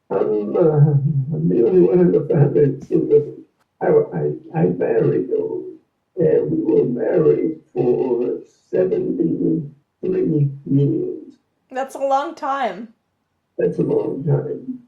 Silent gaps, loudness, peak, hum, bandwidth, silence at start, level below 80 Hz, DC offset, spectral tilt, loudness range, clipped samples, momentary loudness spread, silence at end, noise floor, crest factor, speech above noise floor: none; -19 LUFS; -2 dBFS; none; 7.4 kHz; 0.1 s; -58 dBFS; under 0.1%; -10 dB/octave; 6 LU; under 0.1%; 13 LU; 0.1 s; -70 dBFS; 16 dB; 52 dB